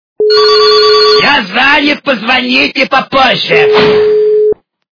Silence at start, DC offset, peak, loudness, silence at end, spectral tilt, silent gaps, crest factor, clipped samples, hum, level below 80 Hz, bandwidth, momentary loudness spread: 0.2 s; under 0.1%; 0 dBFS; -7 LUFS; 0.45 s; -4 dB/octave; none; 8 dB; 2%; none; -44 dBFS; 5.4 kHz; 6 LU